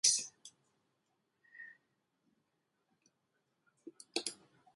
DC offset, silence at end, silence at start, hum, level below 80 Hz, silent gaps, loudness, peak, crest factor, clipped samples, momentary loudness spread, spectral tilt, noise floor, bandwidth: under 0.1%; 0.4 s; 0.05 s; none; under -90 dBFS; none; -37 LUFS; -14 dBFS; 30 dB; under 0.1%; 24 LU; 1.5 dB/octave; -83 dBFS; 11.5 kHz